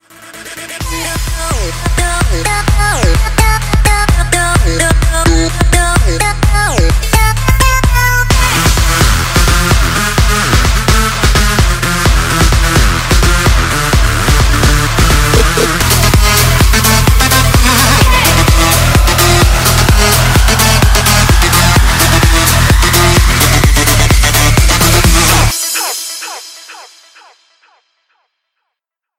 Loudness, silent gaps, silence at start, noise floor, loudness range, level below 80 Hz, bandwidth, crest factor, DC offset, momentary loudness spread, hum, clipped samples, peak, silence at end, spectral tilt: -9 LUFS; none; 0.2 s; -77 dBFS; 4 LU; -12 dBFS; 16.5 kHz; 10 dB; under 0.1%; 6 LU; none; 0.1%; 0 dBFS; 2.35 s; -3.5 dB/octave